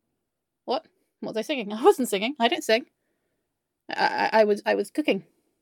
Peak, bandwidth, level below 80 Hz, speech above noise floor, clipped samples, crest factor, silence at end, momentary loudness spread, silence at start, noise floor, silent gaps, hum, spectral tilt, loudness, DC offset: -4 dBFS; 17 kHz; -82 dBFS; 58 dB; under 0.1%; 22 dB; 0.4 s; 11 LU; 0.65 s; -82 dBFS; none; none; -3.5 dB/octave; -25 LUFS; under 0.1%